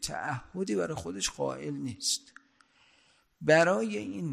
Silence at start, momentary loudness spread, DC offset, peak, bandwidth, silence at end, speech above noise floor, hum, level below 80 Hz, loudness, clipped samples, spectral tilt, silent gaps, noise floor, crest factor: 0 s; 12 LU; under 0.1%; -8 dBFS; 14.5 kHz; 0 s; 36 dB; none; -60 dBFS; -30 LUFS; under 0.1%; -3.5 dB/octave; none; -66 dBFS; 22 dB